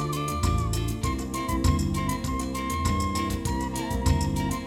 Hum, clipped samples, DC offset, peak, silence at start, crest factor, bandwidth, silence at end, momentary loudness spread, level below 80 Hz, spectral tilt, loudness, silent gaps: none; under 0.1%; under 0.1%; -10 dBFS; 0 s; 16 dB; 17.5 kHz; 0 s; 4 LU; -32 dBFS; -5.5 dB/octave; -27 LUFS; none